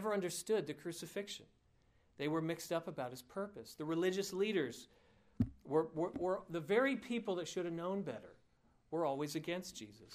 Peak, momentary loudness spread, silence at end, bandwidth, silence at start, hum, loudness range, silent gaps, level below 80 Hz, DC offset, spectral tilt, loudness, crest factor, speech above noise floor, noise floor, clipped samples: -22 dBFS; 10 LU; 0 s; 15.5 kHz; 0 s; none; 4 LU; none; -68 dBFS; under 0.1%; -5 dB/octave; -40 LUFS; 18 dB; 33 dB; -73 dBFS; under 0.1%